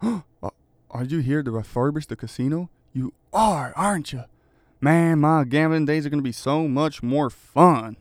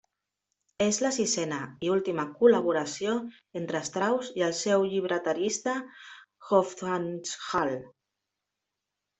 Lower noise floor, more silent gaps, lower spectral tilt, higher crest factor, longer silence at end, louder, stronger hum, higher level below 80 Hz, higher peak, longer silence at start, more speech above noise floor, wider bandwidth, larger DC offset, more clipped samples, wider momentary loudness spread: second, -59 dBFS vs -86 dBFS; neither; first, -7 dB/octave vs -4 dB/octave; about the same, 22 dB vs 22 dB; second, 0.05 s vs 1.3 s; first, -22 LUFS vs -28 LUFS; neither; first, -52 dBFS vs -70 dBFS; first, 0 dBFS vs -8 dBFS; second, 0 s vs 0.8 s; second, 38 dB vs 58 dB; first, 15.5 kHz vs 8.4 kHz; neither; neither; first, 15 LU vs 10 LU